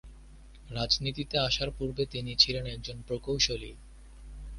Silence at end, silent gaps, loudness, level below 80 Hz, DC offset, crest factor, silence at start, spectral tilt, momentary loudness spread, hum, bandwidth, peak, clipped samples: 0 s; none; -29 LUFS; -46 dBFS; under 0.1%; 24 dB; 0.05 s; -3.5 dB/octave; 16 LU; none; 11.5 kHz; -8 dBFS; under 0.1%